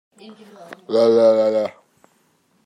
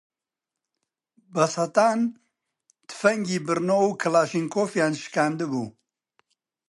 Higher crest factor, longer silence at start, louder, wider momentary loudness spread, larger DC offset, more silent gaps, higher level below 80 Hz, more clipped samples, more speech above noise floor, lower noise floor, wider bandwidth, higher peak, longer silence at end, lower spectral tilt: about the same, 16 dB vs 20 dB; second, 0.25 s vs 1.35 s; first, -17 LUFS vs -24 LUFS; first, 14 LU vs 8 LU; neither; neither; about the same, -76 dBFS vs -74 dBFS; neither; second, 45 dB vs 65 dB; second, -62 dBFS vs -88 dBFS; second, 9.2 kHz vs 11.5 kHz; about the same, -4 dBFS vs -6 dBFS; about the same, 0.95 s vs 1 s; about the same, -6 dB/octave vs -5 dB/octave